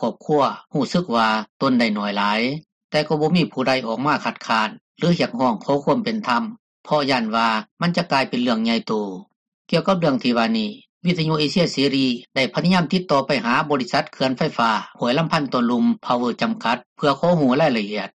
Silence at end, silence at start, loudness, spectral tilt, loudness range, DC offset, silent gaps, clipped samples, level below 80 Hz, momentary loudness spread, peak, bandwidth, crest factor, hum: 0.1 s; 0 s; -20 LUFS; -6 dB/octave; 2 LU; under 0.1%; 1.49-1.60 s, 2.72-2.89 s, 4.81-4.95 s, 6.59-6.84 s, 7.71-7.77 s, 9.36-9.65 s, 10.89-11.01 s, 16.86-16.96 s; under 0.1%; -60 dBFS; 5 LU; -6 dBFS; 10 kHz; 16 dB; none